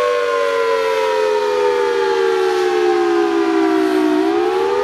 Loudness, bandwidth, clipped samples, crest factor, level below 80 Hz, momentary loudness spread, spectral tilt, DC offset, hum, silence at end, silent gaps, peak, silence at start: -16 LUFS; 14 kHz; under 0.1%; 10 dB; -60 dBFS; 1 LU; -3.5 dB/octave; under 0.1%; none; 0 s; none; -4 dBFS; 0 s